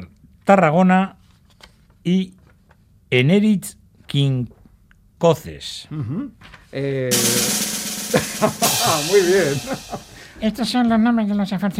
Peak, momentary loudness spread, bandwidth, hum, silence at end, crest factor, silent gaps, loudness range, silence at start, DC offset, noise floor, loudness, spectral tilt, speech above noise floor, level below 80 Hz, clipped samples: 0 dBFS; 14 LU; 16 kHz; none; 0 s; 20 dB; none; 5 LU; 0 s; under 0.1%; -53 dBFS; -19 LUFS; -4.5 dB/octave; 35 dB; -52 dBFS; under 0.1%